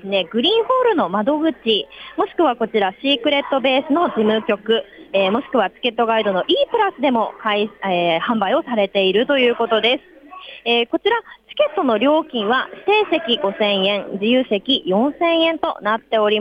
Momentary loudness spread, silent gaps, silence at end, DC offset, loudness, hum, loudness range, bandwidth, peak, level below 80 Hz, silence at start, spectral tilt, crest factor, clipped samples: 5 LU; none; 0 s; under 0.1%; -18 LUFS; none; 1 LU; 6.2 kHz; -6 dBFS; -62 dBFS; 0.05 s; -6.5 dB/octave; 12 dB; under 0.1%